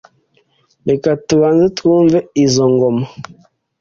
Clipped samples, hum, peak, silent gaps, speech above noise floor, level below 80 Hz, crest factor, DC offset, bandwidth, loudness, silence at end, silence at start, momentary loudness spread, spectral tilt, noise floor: under 0.1%; none; 0 dBFS; none; 45 dB; -50 dBFS; 14 dB; under 0.1%; 7.6 kHz; -13 LUFS; 0.6 s; 0.85 s; 11 LU; -6 dB/octave; -58 dBFS